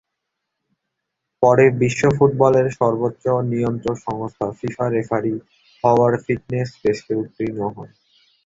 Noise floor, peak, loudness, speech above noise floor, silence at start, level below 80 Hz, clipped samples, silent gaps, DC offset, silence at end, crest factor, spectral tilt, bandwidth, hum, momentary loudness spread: -79 dBFS; -2 dBFS; -19 LUFS; 60 dB; 1.4 s; -52 dBFS; under 0.1%; none; under 0.1%; 0.6 s; 18 dB; -7.5 dB/octave; 8 kHz; none; 11 LU